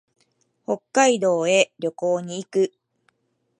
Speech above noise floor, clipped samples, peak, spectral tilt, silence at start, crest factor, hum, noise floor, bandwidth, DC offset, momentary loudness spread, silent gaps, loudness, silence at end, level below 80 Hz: 51 dB; under 0.1%; -2 dBFS; -3.5 dB/octave; 0.7 s; 20 dB; none; -72 dBFS; 11.5 kHz; under 0.1%; 10 LU; none; -22 LUFS; 0.9 s; -78 dBFS